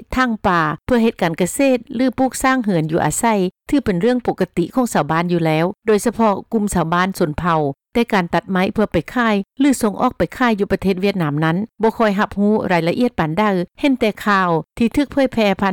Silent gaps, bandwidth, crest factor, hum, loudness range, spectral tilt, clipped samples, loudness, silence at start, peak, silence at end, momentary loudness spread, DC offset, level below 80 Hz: none; 19 kHz; 12 dB; none; 1 LU; -5.5 dB/octave; under 0.1%; -18 LUFS; 0 s; -6 dBFS; 0 s; 3 LU; under 0.1%; -42 dBFS